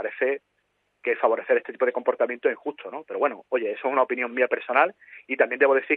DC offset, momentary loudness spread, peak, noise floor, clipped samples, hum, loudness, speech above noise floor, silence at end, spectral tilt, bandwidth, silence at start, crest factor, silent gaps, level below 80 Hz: under 0.1%; 11 LU; -4 dBFS; -72 dBFS; under 0.1%; none; -25 LUFS; 48 dB; 0 s; -7 dB/octave; 4.1 kHz; 0 s; 20 dB; none; -84 dBFS